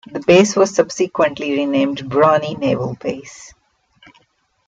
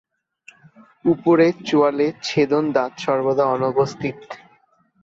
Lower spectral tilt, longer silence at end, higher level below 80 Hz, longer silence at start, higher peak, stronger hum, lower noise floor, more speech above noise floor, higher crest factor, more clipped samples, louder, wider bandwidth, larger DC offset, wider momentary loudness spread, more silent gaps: second, -5 dB/octave vs -6.5 dB/octave; first, 1.2 s vs 0.65 s; first, -56 dBFS vs -62 dBFS; second, 0.1 s vs 1.05 s; about the same, -2 dBFS vs -4 dBFS; neither; about the same, -60 dBFS vs -59 dBFS; first, 44 dB vs 40 dB; about the same, 16 dB vs 16 dB; neither; first, -16 LUFS vs -19 LUFS; first, 9.2 kHz vs 7.8 kHz; neither; about the same, 13 LU vs 12 LU; neither